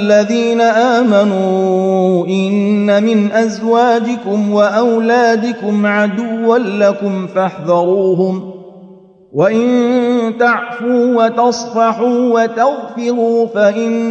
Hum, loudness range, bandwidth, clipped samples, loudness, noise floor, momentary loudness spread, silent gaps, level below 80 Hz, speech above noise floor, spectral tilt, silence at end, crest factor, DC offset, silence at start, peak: none; 3 LU; 8.2 kHz; under 0.1%; -13 LUFS; -40 dBFS; 5 LU; none; -62 dBFS; 28 dB; -6 dB/octave; 0 s; 12 dB; under 0.1%; 0 s; 0 dBFS